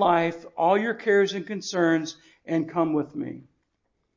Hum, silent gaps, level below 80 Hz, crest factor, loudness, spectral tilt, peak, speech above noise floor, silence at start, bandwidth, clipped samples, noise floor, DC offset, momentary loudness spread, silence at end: none; none; -70 dBFS; 16 dB; -25 LUFS; -5.5 dB/octave; -8 dBFS; 51 dB; 0 s; 7.6 kHz; under 0.1%; -75 dBFS; under 0.1%; 14 LU; 0.75 s